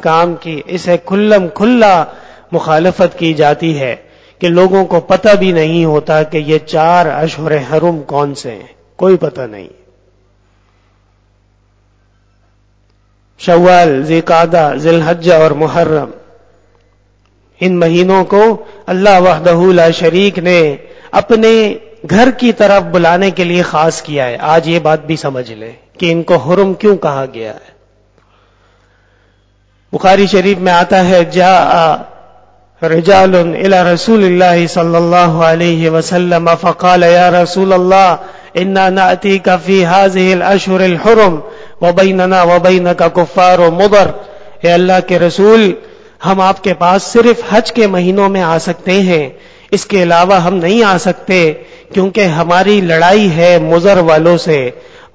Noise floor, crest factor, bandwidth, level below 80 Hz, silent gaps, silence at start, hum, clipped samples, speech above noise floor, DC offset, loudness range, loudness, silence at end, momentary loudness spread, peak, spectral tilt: -51 dBFS; 10 dB; 8 kHz; -44 dBFS; none; 0 s; 50 Hz at -40 dBFS; 1%; 43 dB; under 0.1%; 6 LU; -9 LUFS; 0.35 s; 10 LU; 0 dBFS; -6 dB/octave